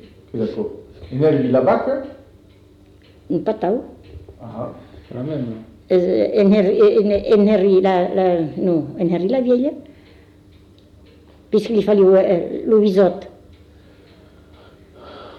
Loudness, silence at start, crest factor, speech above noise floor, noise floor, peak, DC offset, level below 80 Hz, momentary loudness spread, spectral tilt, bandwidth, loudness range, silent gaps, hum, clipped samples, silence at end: -17 LUFS; 0.35 s; 14 dB; 32 dB; -48 dBFS; -4 dBFS; under 0.1%; -50 dBFS; 19 LU; -9 dB/octave; 6.8 kHz; 9 LU; none; none; under 0.1%; 0 s